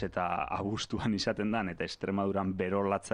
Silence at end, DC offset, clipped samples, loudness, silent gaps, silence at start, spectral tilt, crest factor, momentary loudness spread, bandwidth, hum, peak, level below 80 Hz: 0 s; under 0.1%; under 0.1%; -33 LUFS; none; 0 s; -5.5 dB/octave; 16 dB; 3 LU; 10.5 kHz; none; -16 dBFS; -58 dBFS